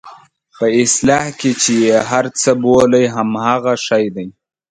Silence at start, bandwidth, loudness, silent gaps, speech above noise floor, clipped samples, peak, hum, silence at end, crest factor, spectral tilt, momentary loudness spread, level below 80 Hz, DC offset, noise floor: 0.05 s; 11 kHz; -14 LUFS; none; 30 dB; under 0.1%; 0 dBFS; none; 0.4 s; 14 dB; -4 dB/octave; 7 LU; -50 dBFS; under 0.1%; -43 dBFS